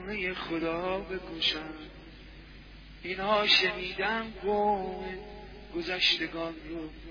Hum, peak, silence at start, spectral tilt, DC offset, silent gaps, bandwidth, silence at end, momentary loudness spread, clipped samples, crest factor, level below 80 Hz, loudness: none; -10 dBFS; 0 s; -4 dB/octave; under 0.1%; none; 5.4 kHz; 0 s; 25 LU; under 0.1%; 22 dB; -52 dBFS; -29 LUFS